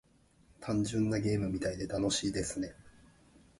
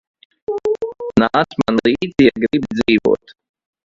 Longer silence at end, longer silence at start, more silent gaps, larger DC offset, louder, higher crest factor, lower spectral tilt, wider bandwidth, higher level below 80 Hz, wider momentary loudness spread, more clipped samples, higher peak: about the same, 0.7 s vs 0.7 s; about the same, 0.6 s vs 0.5 s; neither; neither; second, -34 LUFS vs -17 LUFS; about the same, 16 dB vs 18 dB; second, -5 dB/octave vs -6.5 dB/octave; first, 11.5 kHz vs 7.6 kHz; second, -54 dBFS vs -48 dBFS; about the same, 8 LU vs 9 LU; neither; second, -20 dBFS vs 0 dBFS